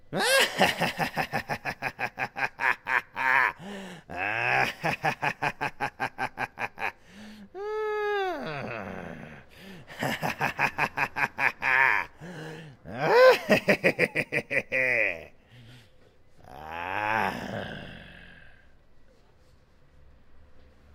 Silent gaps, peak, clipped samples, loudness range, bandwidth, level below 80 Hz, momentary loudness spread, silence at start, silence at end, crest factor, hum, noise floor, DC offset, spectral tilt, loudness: none; -6 dBFS; under 0.1%; 11 LU; 16.5 kHz; -58 dBFS; 20 LU; 0.1 s; 0.3 s; 24 dB; none; -57 dBFS; under 0.1%; -3.5 dB/octave; -26 LUFS